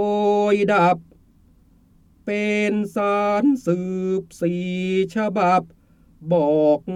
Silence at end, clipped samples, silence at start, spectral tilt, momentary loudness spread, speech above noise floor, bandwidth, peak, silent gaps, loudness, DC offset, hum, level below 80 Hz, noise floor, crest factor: 0 s; under 0.1%; 0 s; -7 dB/octave; 8 LU; 35 dB; 12.5 kHz; -4 dBFS; none; -20 LUFS; under 0.1%; none; -58 dBFS; -55 dBFS; 16 dB